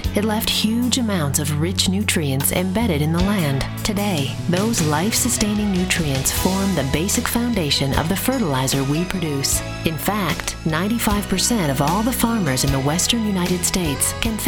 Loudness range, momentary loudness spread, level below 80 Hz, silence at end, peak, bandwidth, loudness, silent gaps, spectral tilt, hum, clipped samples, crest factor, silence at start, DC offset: 1 LU; 3 LU; -34 dBFS; 0 s; 0 dBFS; over 20 kHz; -19 LUFS; none; -4 dB/octave; none; under 0.1%; 20 dB; 0 s; under 0.1%